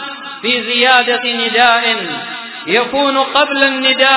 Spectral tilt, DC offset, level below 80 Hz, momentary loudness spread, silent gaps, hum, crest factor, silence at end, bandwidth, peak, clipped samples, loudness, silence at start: -6 dB/octave; under 0.1%; -58 dBFS; 12 LU; none; none; 14 dB; 0 s; 4 kHz; 0 dBFS; 0.2%; -12 LUFS; 0 s